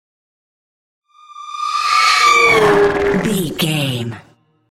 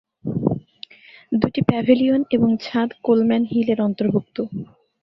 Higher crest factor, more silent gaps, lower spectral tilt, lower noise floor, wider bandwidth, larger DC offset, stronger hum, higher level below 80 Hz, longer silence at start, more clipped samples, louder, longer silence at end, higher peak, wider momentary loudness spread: about the same, 16 dB vs 18 dB; neither; second, -4 dB/octave vs -9 dB/octave; first, -51 dBFS vs -44 dBFS; first, 16.5 kHz vs 6 kHz; neither; neither; first, -44 dBFS vs -54 dBFS; first, 1.3 s vs 0.25 s; neither; first, -13 LUFS vs -20 LUFS; about the same, 0.5 s vs 0.4 s; about the same, -2 dBFS vs -2 dBFS; about the same, 15 LU vs 15 LU